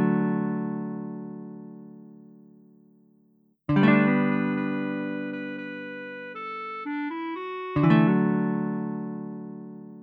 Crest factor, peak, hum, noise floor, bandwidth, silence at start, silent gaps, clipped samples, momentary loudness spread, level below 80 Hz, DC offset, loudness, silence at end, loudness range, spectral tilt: 22 dB; -6 dBFS; none; -63 dBFS; 5 kHz; 0 s; none; under 0.1%; 20 LU; -62 dBFS; under 0.1%; -26 LUFS; 0 s; 7 LU; -10 dB/octave